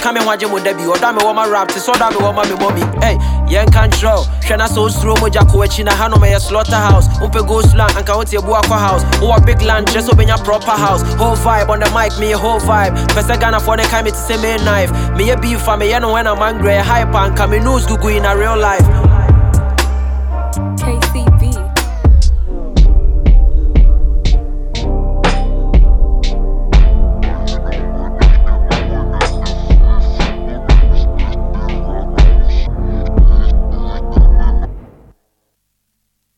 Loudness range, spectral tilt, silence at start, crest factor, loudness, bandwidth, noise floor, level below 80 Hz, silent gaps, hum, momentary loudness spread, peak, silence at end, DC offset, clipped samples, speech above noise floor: 4 LU; -5.5 dB/octave; 0 s; 10 dB; -13 LUFS; 17 kHz; -67 dBFS; -12 dBFS; none; none; 8 LU; 0 dBFS; 1.55 s; under 0.1%; under 0.1%; 56 dB